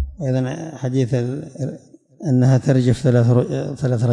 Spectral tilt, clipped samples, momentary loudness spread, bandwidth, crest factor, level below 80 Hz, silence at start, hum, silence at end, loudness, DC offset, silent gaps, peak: -8 dB/octave; under 0.1%; 12 LU; 10 kHz; 12 dB; -42 dBFS; 0 s; none; 0 s; -19 LUFS; under 0.1%; none; -6 dBFS